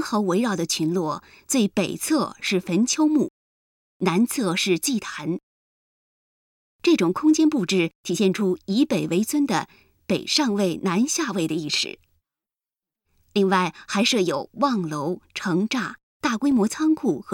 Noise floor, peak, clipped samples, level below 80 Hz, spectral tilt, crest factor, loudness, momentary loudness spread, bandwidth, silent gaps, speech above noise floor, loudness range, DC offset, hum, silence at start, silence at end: under -90 dBFS; -8 dBFS; under 0.1%; -64 dBFS; -4.5 dB/octave; 16 dB; -23 LUFS; 8 LU; 17.5 kHz; 3.30-4.00 s, 5.43-6.79 s, 7.95-8.04 s, 16.03-16.20 s; over 68 dB; 3 LU; under 0.1%; none; 0 s; 0 s